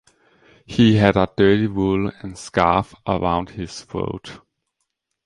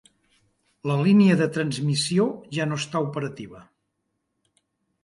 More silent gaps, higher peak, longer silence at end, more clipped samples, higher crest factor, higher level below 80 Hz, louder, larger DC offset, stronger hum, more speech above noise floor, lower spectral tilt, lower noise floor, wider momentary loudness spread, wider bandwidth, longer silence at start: neither; first, -2 dBFS vs -8 dBFS; second, 0.9 s vs 1.4 s; neither; about the same, 20 dB vs 18 dB; first, -42 dBFS vs -66 dBFS; first, -19 LUFS vs -23 LUFS; neither; neither; about the same, 57 dB vs 54 dB; about the same, -6.5 dB/octave vs -6 dB/octave; about the same, -76 dBFS vs -77 dBFS; about the same, 15 LU vs 16 LU; about the same, 11 kHz vs 11.5 kHz; second, 0.7 s vs 0.85 s